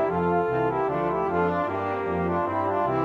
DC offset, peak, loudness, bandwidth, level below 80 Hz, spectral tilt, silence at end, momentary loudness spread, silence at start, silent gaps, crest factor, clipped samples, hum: under 0.1%; -12 dBFS; -25 LUFS; 7 kHz; -54 dBFS; -9 dB/octave; 0 s; 3 LU; 0 s; none; 12 dB; under 0.1%; none